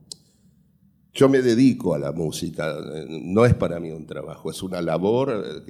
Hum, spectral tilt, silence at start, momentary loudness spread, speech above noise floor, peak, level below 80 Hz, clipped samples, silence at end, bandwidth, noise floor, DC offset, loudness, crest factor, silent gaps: none; -6.5 dB/octave; 1.15 s; 16 LU; 38 dB; -4 dBFS; -48 dBFS; under 0.1%; 0.1 s; 15 kHz; -59 dBFS; under 0.1%; -22 LUFS; 18 dB; none